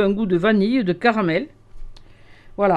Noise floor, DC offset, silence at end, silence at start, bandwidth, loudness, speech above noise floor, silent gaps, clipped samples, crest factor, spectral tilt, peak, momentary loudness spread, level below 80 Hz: -44 dBFS; under 0.1%; 0 s; 0 s; 8.2 kHz; -19 LUFS; 26 dB; none; under 0.1%; 18 dB; -8 dB/octave; -2 dBFS; 12 LU; -42 dBFS